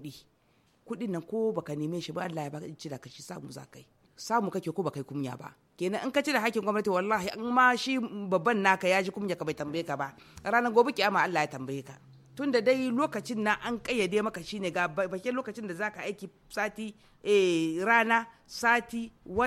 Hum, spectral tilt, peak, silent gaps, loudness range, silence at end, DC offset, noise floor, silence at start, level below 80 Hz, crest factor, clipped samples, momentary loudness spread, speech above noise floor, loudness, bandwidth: none; -4.5 dB/octave; -8 dBFS; none; 8 LU; 0 s; under 0.1%; -67 dBFS; 0 s; -66 dBFS; 22 dB; under 0.1%; 17 LU; 38 dB; -29 LUFS; 16 kHz